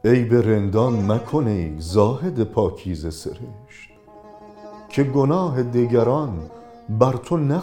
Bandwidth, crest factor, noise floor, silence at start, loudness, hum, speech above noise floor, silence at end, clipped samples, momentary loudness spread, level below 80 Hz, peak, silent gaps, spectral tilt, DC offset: 13 kHz; 20 dB; -45 dBFS; 0.05 s; -20 LUFS; none; 25 dB; 0 s; under 0.1%; 20 LU; -44 dBFS; 0 dBFS; none; -8 dB/octave; under 0.1%